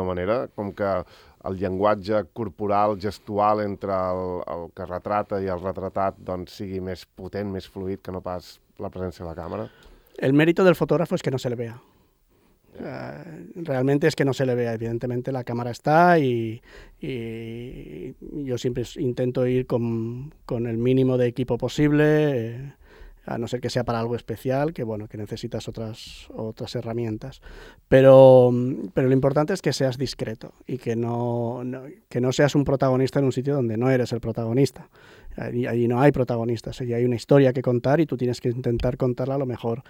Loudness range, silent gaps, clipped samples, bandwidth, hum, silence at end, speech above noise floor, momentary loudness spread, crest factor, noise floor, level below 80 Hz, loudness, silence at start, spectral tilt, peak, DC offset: 11 LU; none; under 0.1%; 16.5 kHz; none; 0.1 s; 38 dB; 16 LU; 22 dB; -61 dBFS; -50 dBFS; -23 LUFS; 0 s; -7.5 dB/octave; -2 dBFS; under 0.1%